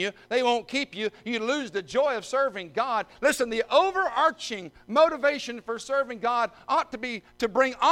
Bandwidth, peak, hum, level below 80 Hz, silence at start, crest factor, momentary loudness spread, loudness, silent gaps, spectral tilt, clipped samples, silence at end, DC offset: 16.5 kHz; -8 dBFS; none; -62 dBFS; 0 s; 18 dB; 10 LU; -26 LUFS; none; -3 dB/octave; under 0.1%; 0 s; under 0.1%